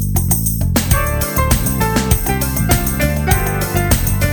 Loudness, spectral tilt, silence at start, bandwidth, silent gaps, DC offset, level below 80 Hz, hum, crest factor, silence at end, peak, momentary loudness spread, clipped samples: -15 LUFS; -4.5 dB/octave; 0 s; over 20 kHz; none; under 0.1%; -20 dBFS; none; 14 dB; 0 s; -2 dBFS; 2 LU; under 0.1%